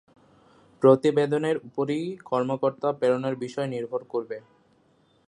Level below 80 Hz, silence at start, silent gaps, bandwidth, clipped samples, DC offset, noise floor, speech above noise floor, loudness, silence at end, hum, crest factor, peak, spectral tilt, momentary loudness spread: -74 dBFS; 0.8 s; none; 10.5 kHz; under 0.1%; under 0.1%; -63 dBFS; 39 dB; -25 LUFS; 0.9 s; none; 22 dB; -4 dBFS; -7 dB/octave; 12 LU